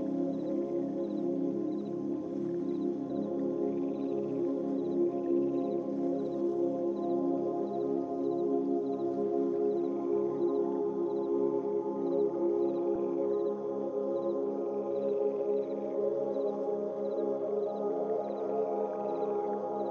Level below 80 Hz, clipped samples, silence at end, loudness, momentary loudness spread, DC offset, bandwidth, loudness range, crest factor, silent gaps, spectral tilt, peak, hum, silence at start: -74 dBFS; under 0.1%; 0 s; -33 LUFS; 4 LU; under 0.1%; 6.4 kHz; 2 LU; 12 dB; none; -9.5 dB/octave; -20 dBFS; none; 0 s